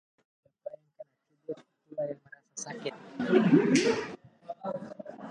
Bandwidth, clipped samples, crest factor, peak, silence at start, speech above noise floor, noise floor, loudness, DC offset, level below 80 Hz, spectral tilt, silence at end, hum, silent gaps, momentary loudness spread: 11 kHz; under 0.1%; 22 dB; -10 dBFS; 0.65 s; 27 dB; -54 dBFS; -29 LUFS; under 0.1%; -74 dBFS; -5.5 dB/octave; 0 s; none; none; 23 LU